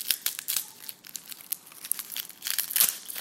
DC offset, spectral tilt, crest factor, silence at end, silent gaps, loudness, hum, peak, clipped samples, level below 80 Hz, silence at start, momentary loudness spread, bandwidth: under 0.1%; 2.5 dB/octave; 32 dB; 0 s; none; -28 LUFS; none; 0 dBFS; under 0.1%; -84 dBFS; 0 s; 17 LU; 16.5 kHz